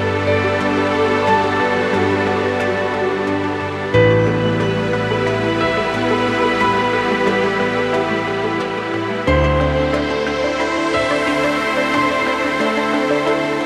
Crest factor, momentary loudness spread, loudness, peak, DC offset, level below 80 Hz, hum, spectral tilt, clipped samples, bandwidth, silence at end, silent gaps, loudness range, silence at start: 16 dB; 4 LU; -17 LUFS; -2 dBFS; under 0.1%; -34 dBFS; none; -6 dB/octave; under 0.1%; 13.5 kHz; 0 s; none; 1 LU; 0 s